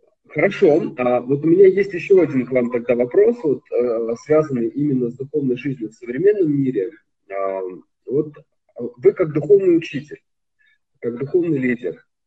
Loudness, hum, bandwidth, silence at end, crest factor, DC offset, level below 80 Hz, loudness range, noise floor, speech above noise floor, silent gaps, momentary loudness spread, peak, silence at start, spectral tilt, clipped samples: -19 LUFS; none; 7.8 kHz; 0.3 s; 16 dB; under 0.1%; -62 dBFS; 5 LU; -63 dBFS; 45 dB; none; 15 LU; -2 dBFS; 0.3 s; -8.5 dB/octave; under 0.1%